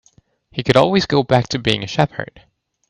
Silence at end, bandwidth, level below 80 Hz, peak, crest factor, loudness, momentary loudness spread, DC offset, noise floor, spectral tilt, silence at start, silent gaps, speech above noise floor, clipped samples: 0.65 s; 11 kHz; -48 dBFS; 0 dBFS; 18 dB; -17 LUFS; 16 LU; under 0.1%; -54 dBFS; -5.5 dB/octave; 0.55 s; none; 38 dB; under 0.1%